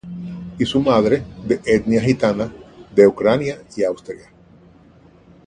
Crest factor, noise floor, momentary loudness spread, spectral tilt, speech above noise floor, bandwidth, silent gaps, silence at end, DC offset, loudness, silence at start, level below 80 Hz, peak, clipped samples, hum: 18 dB; -48 dBFS; 17 LU; -6.5 dB/octave; 31 dB; 9.6 kHz; none; 1.3 s; under 0.1%; -18 LUFS; 0.05 s; -48 dBFS; 0 dBFS; under 0.1%; none